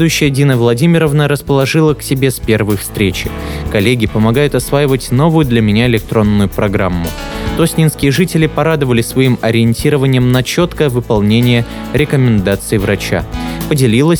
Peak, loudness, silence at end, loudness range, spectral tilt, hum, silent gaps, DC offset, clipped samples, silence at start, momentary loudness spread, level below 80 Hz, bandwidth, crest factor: 0 dBFS; -12 LUFS; 0 s; 1 LU; -6 dB/octave; none; none; under 0.1%; under 0.1%; 0 s; 6 LU; -28 dBFS; over 20 kHz; 12 dB